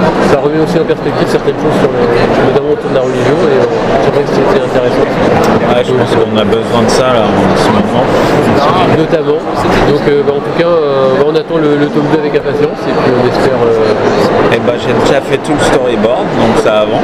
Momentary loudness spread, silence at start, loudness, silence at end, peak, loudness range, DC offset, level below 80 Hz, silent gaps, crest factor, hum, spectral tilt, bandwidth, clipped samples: 3 LU; 0 s; -9 LUFS; 0 s; 0 dBFS; 1 LU; under 0.1%; -30 dBFS; none; 8 dB; none; -6 dB/octave; 15 kHz; 0.4%